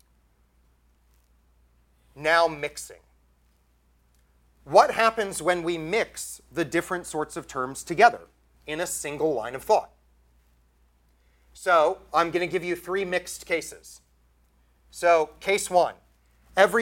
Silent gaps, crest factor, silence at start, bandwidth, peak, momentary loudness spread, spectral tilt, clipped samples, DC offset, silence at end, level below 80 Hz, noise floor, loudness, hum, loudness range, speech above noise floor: none; 24 dB; 2.15 s; 17 kHz; -4 dBFS; 14 LU; -3.5 dB/octave; under 0.1%; under 0.1%; 0 s; -58 dBFS; -64 dBFS; -25 LUFS; none; 5 LU; 39 dB